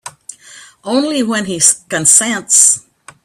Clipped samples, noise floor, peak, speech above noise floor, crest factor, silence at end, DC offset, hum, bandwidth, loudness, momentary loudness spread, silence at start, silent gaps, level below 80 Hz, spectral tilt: 0.2%; -39 dBFS; 0 dBFS; 27 dB; 14 dB; 0.45 s; under 0.1%; none; over 20 kHz; -10 LUFS; 10 LU; 0.05 s; none; -58 dBFS; -1.5 dB/octave